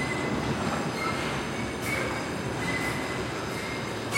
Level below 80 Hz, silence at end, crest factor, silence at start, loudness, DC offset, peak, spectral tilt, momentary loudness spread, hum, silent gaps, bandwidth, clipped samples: -50 dBFS; 0 s; 16 dB; 0 s; -30 LUFS; under 0.1%; -14 dBFS; -4.5 dB/octave; 3 LU; none; none; 16.5 kHz; under 0.1%